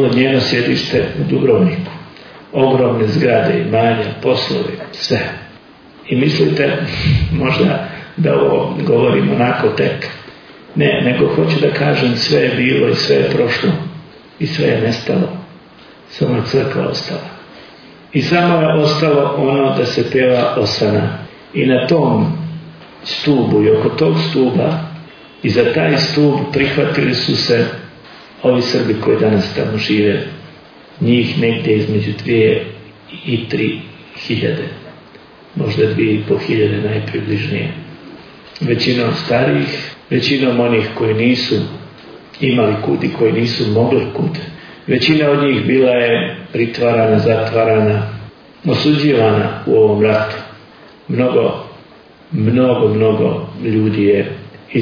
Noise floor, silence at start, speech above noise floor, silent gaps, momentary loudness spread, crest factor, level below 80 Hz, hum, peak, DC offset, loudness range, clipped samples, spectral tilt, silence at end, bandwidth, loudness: -42 dBFS; 0 s; 28 dB; none; 13 LU; 14 dB; -44 dBFS; none; 0 dBFS; under 0.1%; 4 LU; under 0.1%; -7 dB/octave; 0 s; 5.4 kHz; -14 LUFS